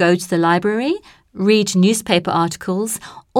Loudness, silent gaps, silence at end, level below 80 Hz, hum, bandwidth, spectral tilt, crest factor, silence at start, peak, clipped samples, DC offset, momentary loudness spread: -17 LUFS; none; 0 s; -56 dBFS; none; 16.5 kHz; -5 dB/octave; 16 dB; 0 s; -2 dBFS; under 0.1%; under 0.1%; 8 LU